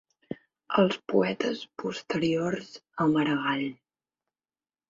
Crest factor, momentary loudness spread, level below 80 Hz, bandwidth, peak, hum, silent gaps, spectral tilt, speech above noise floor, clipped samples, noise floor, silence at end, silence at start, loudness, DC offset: 20 dB; 17 LU; -68 dBFS; 7.6 kHz; -10 dBFS; none; none; -6 dB/octave; over 63 dB; under 0.1%; under -90 dBFS; 1.15 s; 0.3 s; -28 LUFS; under 0.1%